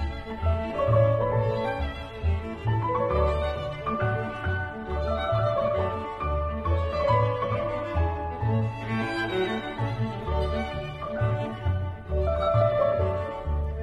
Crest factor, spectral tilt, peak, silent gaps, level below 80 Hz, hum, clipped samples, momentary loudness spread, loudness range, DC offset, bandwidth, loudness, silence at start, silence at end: 16 dB; -8 dB/octave; -10 dBFS; none; -36 dBFS; none; under 0.1%; 8 LU; 3 LU; under 0.1%; 8 kHz; -27 LUFS; 0 s; 0 s